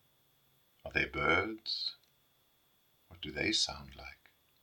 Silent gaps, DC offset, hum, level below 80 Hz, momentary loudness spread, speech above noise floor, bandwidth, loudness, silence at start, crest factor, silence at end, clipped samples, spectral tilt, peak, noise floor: none; under 0.1%; none; -60 dBFS; 21 LU; 37 dB; 18 kHz; -33 LUFS; 0.85 s; 24 dB; 0.5 s; under 0.1%; -2.5 dB/octave; -14 dBFS; -72 dBFS